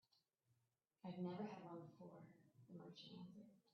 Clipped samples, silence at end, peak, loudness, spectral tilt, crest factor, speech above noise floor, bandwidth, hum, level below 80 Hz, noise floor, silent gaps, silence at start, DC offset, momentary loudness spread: under 0.1%; 0.15 s; -38 dBFS; -56 LUFS; -6.5 dB/octave; 18 dB; 35 dB; 6.4 kHz; none; under -90 dBFS; -89 dBFS; none; 0.15 s; under 0.1%; 15 LU